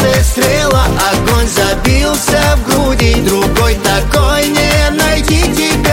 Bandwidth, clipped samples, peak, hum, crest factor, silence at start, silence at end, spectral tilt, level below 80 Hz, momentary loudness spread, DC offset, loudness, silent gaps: 17 kHz; under 0.1%; 0 dBFS; none; 10 dB; 0 s; 0 s; -4 dB/octave; -16 dBFS; 1 LU; 0.3%; -11 LUFS; none